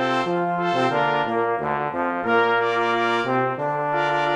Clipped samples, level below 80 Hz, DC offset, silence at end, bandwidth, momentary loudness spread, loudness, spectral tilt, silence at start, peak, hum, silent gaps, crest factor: under 0.1%; -62 dBFS; under 0.1%; 0 s; 10.5 kHz; 4 LU; -22 LUFS; -6 dB/octave; 0 s; -8 dBFS; none; none; 14 dB